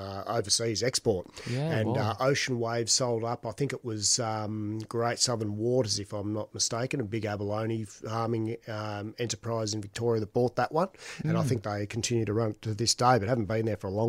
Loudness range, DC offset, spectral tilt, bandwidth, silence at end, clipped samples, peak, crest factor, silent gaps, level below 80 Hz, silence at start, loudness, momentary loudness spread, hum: 4 LU; under 0.1%; -4 dB/octave; 16 kHz; 0 s; under 0.1%; -10 dBFS; 20 dB; none; -62 dBFS; 0 s; -29 LUFS; 9 LU; none